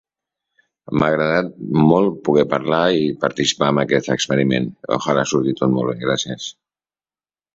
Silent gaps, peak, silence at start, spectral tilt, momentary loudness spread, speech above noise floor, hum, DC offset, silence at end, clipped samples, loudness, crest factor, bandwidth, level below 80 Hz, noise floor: none; -2 dBFS; 0.9 s; -5 dB/octave; 6 LU; over 72 dB; none; under 0.1%; 1.05 s; under 0.1%; -18 LUFS; 18 dB; 7.8 kHz; -52 dBFS; under -90 dBFS